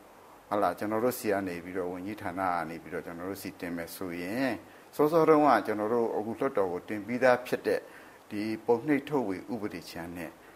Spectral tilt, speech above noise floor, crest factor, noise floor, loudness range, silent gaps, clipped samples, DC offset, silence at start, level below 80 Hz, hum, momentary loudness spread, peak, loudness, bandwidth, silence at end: -6 dB/octave; 24 dB; 22 dB; -54 dBFS; 8 LU; none; under 0.1%; under 0.1%; 0 s; -68 dBFS; none; 14 LU; -8 dBFS; -30 LUFS; 16 kHz; 0.05 s